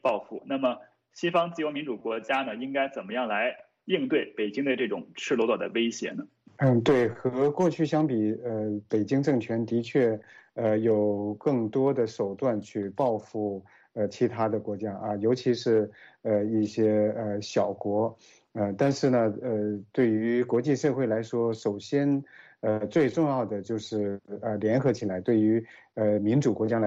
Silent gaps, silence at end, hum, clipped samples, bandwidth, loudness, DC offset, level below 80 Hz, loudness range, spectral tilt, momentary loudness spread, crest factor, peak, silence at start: none; 0 s; none; under 0.1%; 8 kHz; -27 LUFS; under 0.1%; -70 dBFS; 3 LU; -7 dB/octave; 8 LU; 18 dB; -10 dBFS; 0.05 s